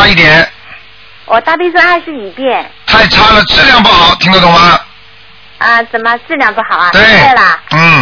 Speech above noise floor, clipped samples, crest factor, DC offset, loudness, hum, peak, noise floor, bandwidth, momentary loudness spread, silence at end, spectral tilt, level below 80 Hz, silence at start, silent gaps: 31 dB; 6%; 8 dB; under 0.1%; -5 LUFS; none; 0 dBFS; -37 dBFS; 5.4 kHz; 10 LU; 0 s; -4.5 dB/octave; -30 dBFS; 0 s; none